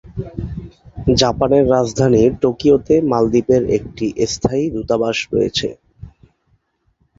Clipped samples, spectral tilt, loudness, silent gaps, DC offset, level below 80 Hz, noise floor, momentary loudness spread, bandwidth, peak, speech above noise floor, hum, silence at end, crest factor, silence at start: under 0.1%; -5.5 dB/octave; -16 LUFS; none; under 0.1%; -38 dBFS; -63 dBFS; 14 LU; 7.8 kHz; 0 dBFS; 47 dB; none; 1.1 s; 16 dB; 0.05 s